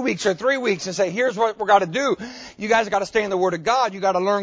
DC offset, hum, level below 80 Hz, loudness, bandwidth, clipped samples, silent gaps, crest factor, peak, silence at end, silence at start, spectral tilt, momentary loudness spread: under 0.1%; none; -58 dBFS; -21 LUFS; 8 kHz; under 0.1%; none; 18 dB; -2 dBFS; 0 s; 0 s; -4 dB/octave; 5 LU